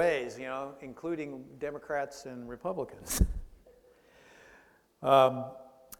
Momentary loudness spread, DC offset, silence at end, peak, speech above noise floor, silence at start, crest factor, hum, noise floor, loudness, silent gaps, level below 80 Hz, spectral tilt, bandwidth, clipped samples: 19 LU; under 0.1%; 0.05 s; -10 dBFS; 31 dB; 0 s; 24 dB; none; -62 dBFS; -32 LUFS; none; -42 dBFS; -5 dB/octave; 18.5 kHz; under 0.1%